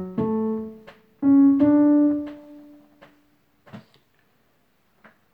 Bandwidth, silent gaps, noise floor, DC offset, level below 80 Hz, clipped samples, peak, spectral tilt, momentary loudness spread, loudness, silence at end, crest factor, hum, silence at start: 3.3 kHz; none; -66 dBFS; under 0.1%; -62 dBFS; under 0.1%; -8 dBFS; -10.5 dB/octave; 20 LU; -19 LUFS; 1.55 s; 16 dB; none; 0 s